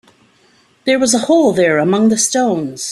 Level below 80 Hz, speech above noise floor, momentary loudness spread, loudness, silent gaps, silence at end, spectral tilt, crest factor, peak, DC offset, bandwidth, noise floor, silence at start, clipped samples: -56 dBFS; 40 dB; 6 LU; -13 LUFS; none; 0 s; -3.5 dB/octave; 14 dB; 0 dBFS; under 0.1%; 14 kHz; -53 dBFS; 0.85 s; under 0.1%